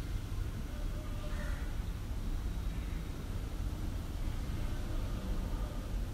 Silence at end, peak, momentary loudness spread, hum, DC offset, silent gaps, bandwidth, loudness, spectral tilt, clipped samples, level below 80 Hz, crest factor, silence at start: 0 s; -26 dBFS; 2 LU; none; under 0.1%; none; 16 kHz; -41 LUFS; -6 dB/octave; under 0.1%; -38 dBFS; 12 dB; 0 s